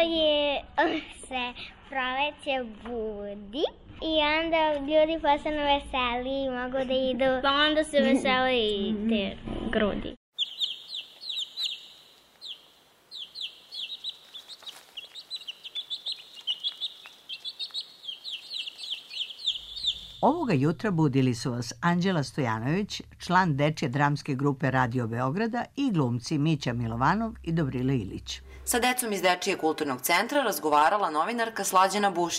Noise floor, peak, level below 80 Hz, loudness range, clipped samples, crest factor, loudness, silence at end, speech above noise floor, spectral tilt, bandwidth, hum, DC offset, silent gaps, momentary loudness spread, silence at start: -59 dBFS; -10 dBFS; -52 dBFS; 10 LU; under 0.1%; 18 dB; -27 LUFS; 0 s; 33 dB; -4.5 dB/octave; 16 kHz; none; under 0.1%; 10.17-10.32 s; 13 LU; 0 s